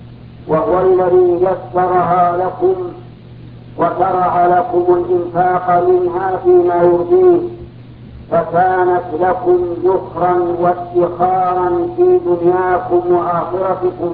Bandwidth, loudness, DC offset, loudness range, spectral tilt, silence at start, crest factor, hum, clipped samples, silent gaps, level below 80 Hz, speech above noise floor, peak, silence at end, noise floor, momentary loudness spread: 4.3 kHz; -14 LUFS; under 0.1%; 3 LU; -12 dB/octave; 0 s; 14 dB; none; under 0.1%; none; -44 dBFS; 21 dB; 0 dBFS; 0 s; -34 dBFS; 6 LU